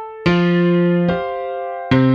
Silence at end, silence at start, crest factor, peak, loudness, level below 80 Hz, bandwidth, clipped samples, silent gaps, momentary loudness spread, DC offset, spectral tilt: 0 s; 0 s; 14 dB; -2 dBFS; -17 LUFS; -46 dBFS; 6.4 kHz; under 0.1%; none; 10 LU; under 0.1%; -8.5 dB/octave